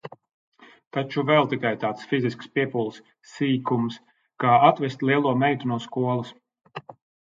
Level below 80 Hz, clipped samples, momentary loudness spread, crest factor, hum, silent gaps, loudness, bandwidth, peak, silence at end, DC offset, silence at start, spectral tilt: -70 dBFS; under 0.1%; 21 LU; 24 dB; none; 0.34-0.52 s, 0.87-0.91 s; -24 LUFS; 7.6 kHz; -2 dBFS; 0.35 s; under 0.1%; 0.05 s; -7 dB/octave